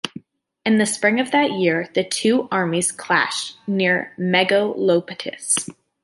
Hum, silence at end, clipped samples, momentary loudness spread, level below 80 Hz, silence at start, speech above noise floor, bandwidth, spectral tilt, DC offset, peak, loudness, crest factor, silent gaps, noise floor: none; 0.3 s; under 0.1%; 8 LU; -68 dBFS; 0.05 s; 22 dB; 11.5 kHz; -3.5 dB/octave; under 0.1%; -2 dBFS; -19 LUFS; 18 dB; none; -41 dBFS